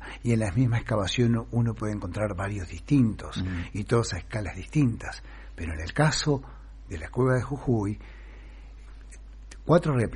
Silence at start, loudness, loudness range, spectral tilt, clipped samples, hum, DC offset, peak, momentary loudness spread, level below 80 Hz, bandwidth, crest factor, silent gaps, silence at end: 0 s; -27 LUFS; 2 LU; -6.5 dB/octave; under 0.1%; none; under 0.1%; -8 dBFS; 23 LU; -42 dBFS; 11 kHz; 18 dB; none; 0 s